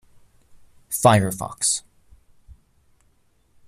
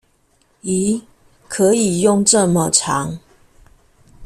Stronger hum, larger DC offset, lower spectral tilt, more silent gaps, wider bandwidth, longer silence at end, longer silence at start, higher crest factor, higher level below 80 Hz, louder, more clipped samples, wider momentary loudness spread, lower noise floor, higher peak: neither; neither; about the same, -4 dB/octave vs -4 dB/octave; neither; about the same, 15 kHz vs 14 kHz; first, 1.9 s vs 0 s; first, 0.9 s vs 0.65 s; about the same, 22 dB vs 18 dB; about the same, -52 dBFS vs -50 dBFS; second, -20 LUFS vs -16 LUFS; neither; second, 10 LU vs 15 LU; about the same, -61 dBFS vs -59 dBFS; about the same, -2 dBFS vs 0 dBFS